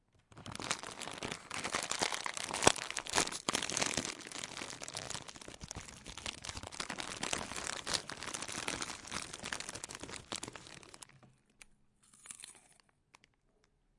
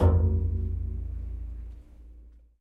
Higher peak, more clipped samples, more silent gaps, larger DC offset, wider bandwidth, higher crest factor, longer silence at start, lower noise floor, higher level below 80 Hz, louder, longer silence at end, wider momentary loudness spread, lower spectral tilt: first, -4 dBFS vs -10 dBFS; neither; neither; neither; first, 11.5 kHz vs 2 kHz; first, 36 dB vs 18 dB; first, 0.3 s vs 0 s; first, -74 dBFS vs -51 dBFS; second, -64 dBFS vs -32 dBFS; second, -38 LUFS vs -30 LUFS; first, 1.25 s vs 0.3 s; second, 16 LU vs 22 LU; second, -1.5 dB/octave vs -11 dB/octave